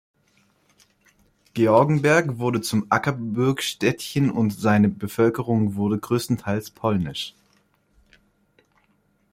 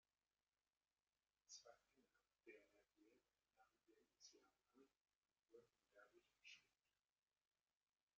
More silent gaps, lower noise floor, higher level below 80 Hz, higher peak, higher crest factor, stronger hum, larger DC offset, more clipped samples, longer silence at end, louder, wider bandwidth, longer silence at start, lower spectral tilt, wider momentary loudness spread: second, none vs 5.01-5.05 s, 5.18-5.22 s; second, -65 dBFS vs under -90 dBFS; first, -58 dBFS vs under -90 dBFS; first, -4 dBFS vs -50 dBFS; second, 20 dB vs 26 dB; first, 50 Hz at -45 dBFS vs none; neither; neither; first, 2 s vs 1.2 s; first, -22 LUFS vs -67 LUFS; first, 16.5 kHz vs 7 kHz; first, 1.55 s vs 1.15 s; first, -6 dB/octave vs 0 dB/octave; first, 8 LU vs 5 LU